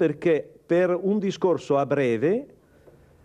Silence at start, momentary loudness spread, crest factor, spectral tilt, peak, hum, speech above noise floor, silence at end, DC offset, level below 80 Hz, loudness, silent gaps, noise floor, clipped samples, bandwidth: 0 s; 3 LU; 14 dB; -7.5 dB/octave; -10 dBFS; none; 31 dB; 0.8 s; under 0.1%; -66 dBFS; -24 LUFS; none; -54 dBFS; under 0.1%; 9.6 kHz